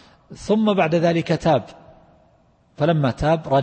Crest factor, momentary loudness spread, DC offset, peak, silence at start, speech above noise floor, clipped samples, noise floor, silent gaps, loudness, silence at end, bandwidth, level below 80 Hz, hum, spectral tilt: 14 dB; 5 LU; under 0.1%; -6 dBFS; 0.3 s; 39 dB; under 0.1%; -58 dBFS; none; -20 LUFS; 0 s; 8.8 kHz; -44 dBFS; none; -7 dB/octave